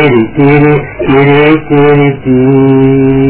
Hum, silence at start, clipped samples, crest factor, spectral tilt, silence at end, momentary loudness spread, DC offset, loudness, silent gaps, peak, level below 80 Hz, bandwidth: none; 0 s; 2%; 6 dB; -11.5 dB/octave; 0 s; 4 LU; under 0.1%; -6 LUFS; none; 0 dBFS; -32 dBFS; 4 kHz